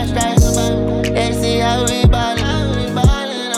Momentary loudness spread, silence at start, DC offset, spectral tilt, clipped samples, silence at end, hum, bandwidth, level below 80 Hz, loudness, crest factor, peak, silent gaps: 4 LU; 0 s; under 0.1%; -5 dB/octave; under 0.1%; 0 s; none; 16.5 kHz; -22 dBFS; -15 LUFS; 14 dB; 0 dBFS; none